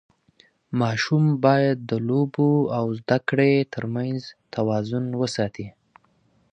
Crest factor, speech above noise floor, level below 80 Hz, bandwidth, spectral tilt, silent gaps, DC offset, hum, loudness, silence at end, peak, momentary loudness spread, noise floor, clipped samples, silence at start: 20 dB; 41 dB; -62 dBFS; 9.4 kHz; -7 dB/octave; none; under 0.1%; none; -23 LUFS; 0.85 s; -4 dBFS; 10 LU; -63 dBFS; under 0.1%; 0.7 s